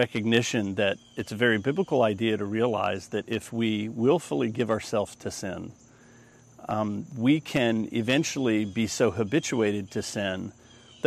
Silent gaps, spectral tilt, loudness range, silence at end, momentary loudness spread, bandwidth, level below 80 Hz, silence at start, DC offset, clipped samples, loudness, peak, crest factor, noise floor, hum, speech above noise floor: none; -5 dB/octave; 4 LU; 0 s; 10 LU; 14 kHz; -64 dBFS; 0 s; under 0.1%; under 0.1%; -27 LUFS; -6 dBFS; 20 dB; -54 dBFS; none; 27 dB